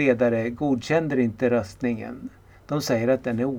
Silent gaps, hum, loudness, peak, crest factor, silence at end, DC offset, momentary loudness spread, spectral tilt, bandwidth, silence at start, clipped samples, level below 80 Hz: none; none; -24 LUFS; -6 dBFS; 18 dB; 0 s; under 0.1%; 10 LU; -6.5 dB/octave; 17.5 kHz; 0 s; under 0.1%; -54 dBFS